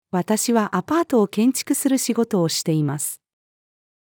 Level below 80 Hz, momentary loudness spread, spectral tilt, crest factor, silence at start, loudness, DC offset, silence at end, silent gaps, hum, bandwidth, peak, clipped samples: -70 dBFS; 5 LU; -4.5 dB/octave; 16 dB; 0.15 s; -21 LUFS; under 0.1%; 0.9 s; none; none; over 20 kHz; -6 dBFS; under 0.1%